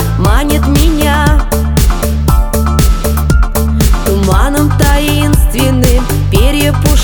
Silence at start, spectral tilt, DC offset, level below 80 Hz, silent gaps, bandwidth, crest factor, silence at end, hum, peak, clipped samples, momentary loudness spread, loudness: 0 s; -5.5 dB/octave; under 0.1%; -12 dBFS; none; over 20 kHz; 8 dB; 0 s; none; 0 dBFS; 0.4%; 3 LU; -11 LUFS